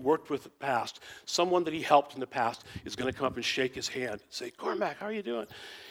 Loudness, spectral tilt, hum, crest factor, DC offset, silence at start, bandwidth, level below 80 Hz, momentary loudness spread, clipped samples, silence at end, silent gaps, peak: -32 LUFS; -3.5 dB/octave; none; 22 dB; under 0.1%; 0 s; 17 kHz; -66 dBFS; 14 LU; under 0.1%; 0 s; none; -8 dBFS